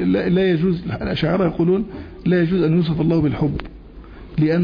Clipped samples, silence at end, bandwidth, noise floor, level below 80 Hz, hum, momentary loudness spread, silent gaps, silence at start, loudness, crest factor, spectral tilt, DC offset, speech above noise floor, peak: under 0.1%; 0 s; 5.2 kHz; -38 dBFS; -38 dBFS; none; 9 LU; none; 0 s; -19 LUFS; 12 dB; -10 dB/octave; under 0.1%; 20 dB; -8 dBFS